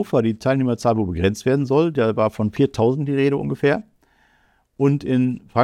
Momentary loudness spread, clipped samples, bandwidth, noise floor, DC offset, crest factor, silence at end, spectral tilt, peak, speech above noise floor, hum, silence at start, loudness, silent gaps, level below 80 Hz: 3 LU; under 0.1%; 13.5 kHz; -61 dBFS; under 0.1%; 18 dB; 0 s; -7.5 dB/octave; -2 dBFS; 42 dB; none; 0 s; -20 LUFS; none; -50 dBFS